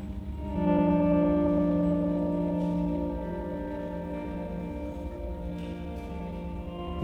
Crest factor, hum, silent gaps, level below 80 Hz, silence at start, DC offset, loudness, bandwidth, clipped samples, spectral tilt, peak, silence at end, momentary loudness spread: 16 dB; none; none; -40 dBFS; 0 s; under 0.1%; -30 LUFS; 4.5 kHz; under 0.1%; -10 dB/octave; -14 dBFS; 0 s; 13 LU